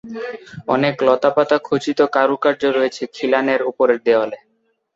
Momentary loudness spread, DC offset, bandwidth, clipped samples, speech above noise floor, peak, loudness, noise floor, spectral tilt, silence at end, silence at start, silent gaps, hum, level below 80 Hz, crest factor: 13 LU; under 0.1%; 7.8 kHz; under 0.1%; 48 dB; -2 dBFS; -17 LUFS; -66 dBFS; -5.5 dB/octave; 0.6 s; 0.05 s; none; none; -62 dBFS; 16 dB